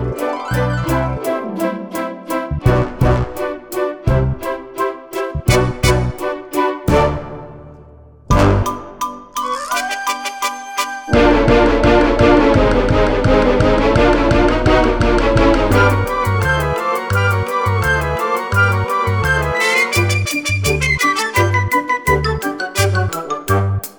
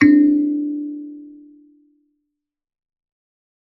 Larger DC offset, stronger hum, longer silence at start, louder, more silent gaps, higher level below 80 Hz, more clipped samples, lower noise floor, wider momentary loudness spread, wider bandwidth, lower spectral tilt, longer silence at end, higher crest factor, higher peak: neither; neither; about the same, 0 s vs 0 s; about the same, -16 LUFS vs -18 LUFS; neither; first, -26 dBFS vs -66 dBFS; neither; second, -41 dBFS vs -80 dBFS; second, 10 LU vs 23 LU; first, over 20 kHz vs 6 kHz; second, -5.5 dB/octave vs -7 dB/octave; second, 0.05 s vs 2.35 s; about the same, 16 dB vs 18 dB; about the same, 0 dBFS vs -2 dBFS